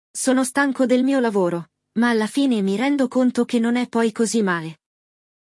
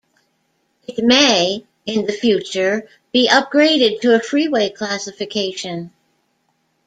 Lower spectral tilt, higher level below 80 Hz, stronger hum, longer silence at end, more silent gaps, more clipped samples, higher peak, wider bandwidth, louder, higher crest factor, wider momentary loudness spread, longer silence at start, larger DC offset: first, -4.5 dB/octave vs -3 dB/octave; second, -72 dBFS vs -62 dBFS; neither; second, 0.8 s vs 1 s; neither; neither; second, -6 dBFS vs 0 dBFS; first, 12 kHz vs 9.2 kHz; second, -20 LUFS vs -16 LUFS; about the same, 16 dB vs 18 dB; second, 5 LU vs 14 LU; second, 0.15 s vs 0.9 s; neither